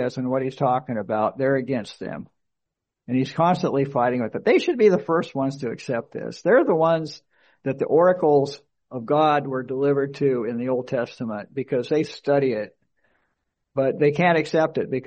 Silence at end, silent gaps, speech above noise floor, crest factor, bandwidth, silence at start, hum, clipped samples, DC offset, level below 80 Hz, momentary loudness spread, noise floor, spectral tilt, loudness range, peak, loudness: 0.05 s; none; 61 dB; 16 dB; 8.4 kHz; 0 s; none; under 0.1%; under 0.1%; -66 dBFS; 13 LU; -82 dBFS; -7 dB/octave; 4 LU; -6 dBFS; -22 LUFS